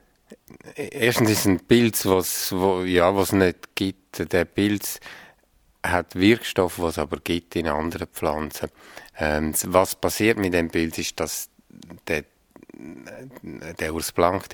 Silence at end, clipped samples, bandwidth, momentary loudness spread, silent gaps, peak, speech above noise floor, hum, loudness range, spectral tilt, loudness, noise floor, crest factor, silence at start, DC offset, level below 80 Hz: 0 s; under 0.1%; over 20 kHz; 19 LU; none; -2 dBFS; 38 dB; none; 7 LU; -4.5 dB/octave; -23 LUFS; -61 dBFS; 22 dB; 0.3 s; under 0.1%; -46 dBFS